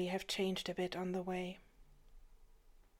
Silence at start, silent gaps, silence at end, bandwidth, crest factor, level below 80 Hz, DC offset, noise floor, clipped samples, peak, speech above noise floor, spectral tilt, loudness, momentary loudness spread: 0 s; none; 0.2 s; 16.5 kHz; 16 dB; -64 dBFS; under 0.1%; -64 dBFS; under 0.1%; -26 dBFS; 24 dB; -5 dB/octave; -40 LUFS; 8 LU